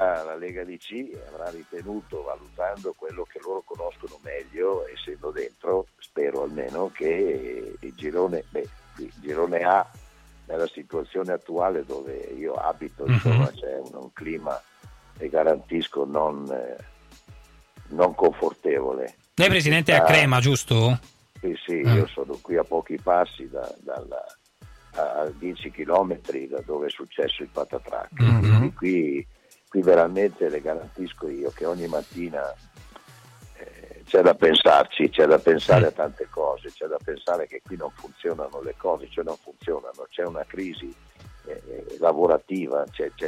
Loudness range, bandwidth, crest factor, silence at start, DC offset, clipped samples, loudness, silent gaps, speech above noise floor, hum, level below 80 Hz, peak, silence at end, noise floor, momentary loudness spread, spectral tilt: 12 LU; 14.5 kHz; 18 dB; 0 s; under 0.1%; under 0.1%; -24 LUFS; none; 26 dB; none; -52 dBFS; -6 dBFS; 0 s; -50 dBFS; 18 LU; -6 dB/octave